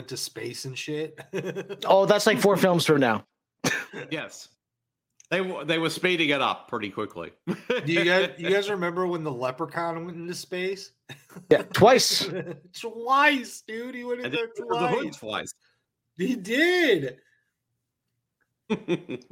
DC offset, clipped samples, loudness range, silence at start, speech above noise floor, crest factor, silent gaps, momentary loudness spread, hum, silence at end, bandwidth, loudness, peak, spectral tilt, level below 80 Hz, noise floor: under 0.1%; under 0.1%; 5 LU; 0 s; 60 dB; 22 dB; none; 16 LU; none; 0.1 s; 16.5 kHz; -25 LUFS; -4 dBFS; -4 dB/octave; -68 dBFS; -85 dBFS